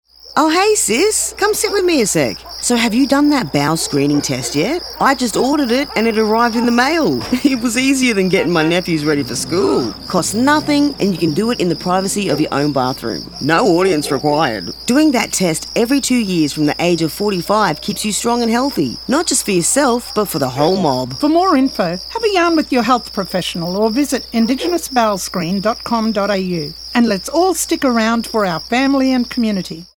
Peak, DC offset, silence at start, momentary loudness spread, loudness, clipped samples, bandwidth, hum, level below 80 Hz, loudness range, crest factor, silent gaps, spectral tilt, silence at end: 0 dBFS; under 0.1%; 0.25 s; 6 LU; -15 LUFS; under 0.1%; over 20 kHz; none; -44 dBFS; 2 LU; 16 dB; none; -4 dB/octave; 0.1 s